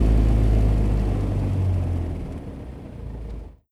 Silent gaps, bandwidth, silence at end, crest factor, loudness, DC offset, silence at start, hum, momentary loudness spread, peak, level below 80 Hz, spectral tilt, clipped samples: none; 5.6 kHz; 0.25 s; 16 dB; -23 LUFS; under 0.1%; 0 s; none; 17 LU; -6 dBFS; -24 dBFS; -9 dB/octave; under 0.1%